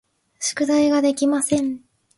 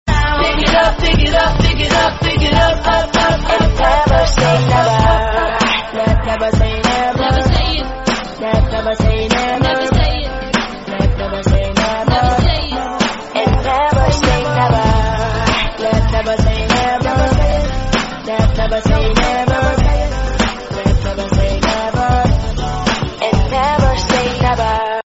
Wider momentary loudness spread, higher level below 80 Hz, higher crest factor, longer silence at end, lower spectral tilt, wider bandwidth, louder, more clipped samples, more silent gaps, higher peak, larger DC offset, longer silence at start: first, 10 LU vs 6 LU; second, -62 dBFS vs -18 dBFS; about the same, 14 dB vs 14 dB; first, 0.4 s vs 0.05 s; second, -3.5 dB/octave vs -5.5 dB/octave; first, 12 kHz vs 8 kHz; second, -20 LUFS vs -14 LUFS; neither; neither; second, -8 dBFS vs 0 dBFS; neither; first, 0.4 s vs 0.05 s